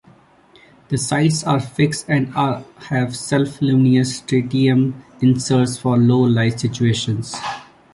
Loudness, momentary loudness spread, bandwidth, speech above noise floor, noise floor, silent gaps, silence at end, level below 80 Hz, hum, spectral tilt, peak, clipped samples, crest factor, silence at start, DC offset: -18 LUFS; 9 LU; 11.5 kHz; 33 dB; -50 dBFS; none; 0.3 s; -52 dBFS; none; -6 dB/octave; -4 dBFS; under 0.1%; 14 dB; 0.9 s; under 0.1%